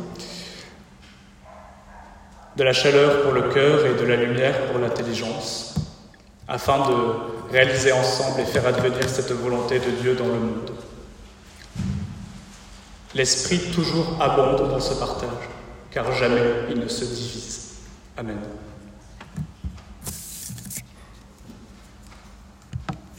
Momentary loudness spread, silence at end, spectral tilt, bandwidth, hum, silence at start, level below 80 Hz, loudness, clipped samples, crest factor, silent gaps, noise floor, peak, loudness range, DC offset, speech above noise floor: 20 LU; 0.05 s; -4.5 dB/octave; 16 kHz; none; 0 s; -46 dBFS; -22 LUFS; under 0.1%; 22 dB; none; -48 dBFS; -2 dBFS; 16 LU; under 0.1%; 27 dB